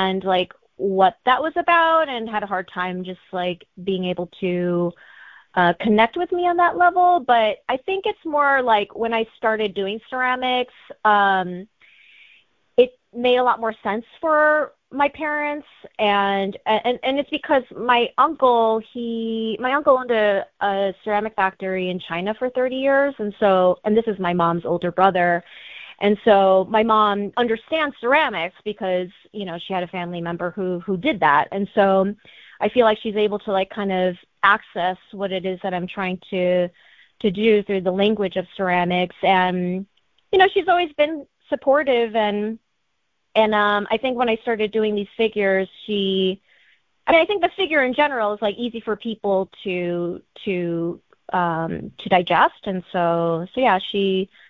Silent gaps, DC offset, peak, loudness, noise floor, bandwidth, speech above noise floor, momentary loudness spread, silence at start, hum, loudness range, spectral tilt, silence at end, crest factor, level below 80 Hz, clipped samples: none; under 0.1%; 0 dBFS; -20 LUFS; -74 dBFS; 6.4 kHz; 54 dB; 10 LU; 0 s; none; 4 LU; -8 dB/octave; 0.25 s; 20 dB; -58 dBFS; under 0.1%